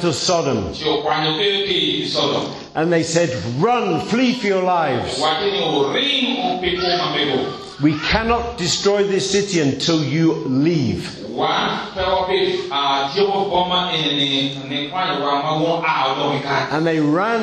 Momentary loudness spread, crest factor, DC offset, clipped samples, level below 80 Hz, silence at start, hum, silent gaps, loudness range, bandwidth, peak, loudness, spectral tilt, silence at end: 4 LU; 16 dB; under 0.1%; under 0.1%; -44 dBFS; 0 s; none; none; 1 LU; 11.5 kHz; -4 dBFS; -18 LUFS; -4.5 dB/octave; 0 s